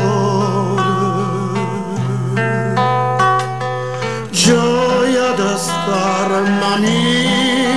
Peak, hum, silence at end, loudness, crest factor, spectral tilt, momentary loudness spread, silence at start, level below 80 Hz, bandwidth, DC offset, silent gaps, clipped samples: 0 dBFS; none; 0 s; -15 LUFS; 14 dB; -4.5 dB/octave; 7 LU; 0 s; -50 dBFS; 11 kHz; 1%; none; under 0.1%